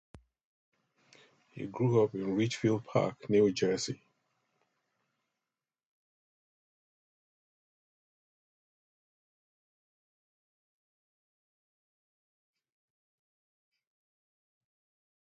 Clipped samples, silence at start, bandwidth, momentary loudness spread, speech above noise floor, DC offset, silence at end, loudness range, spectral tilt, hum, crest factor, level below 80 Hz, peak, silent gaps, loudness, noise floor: under 0.1%; 1.55 s; 8.8 kHz; 13 LU; over 60 dB; under 0.1%; 11.25 s; 6 LU; -6 dB/octave; none; 24 dB; -74 dBFS; -14 dBFS; none; -30 LUFS; under -90 dBFS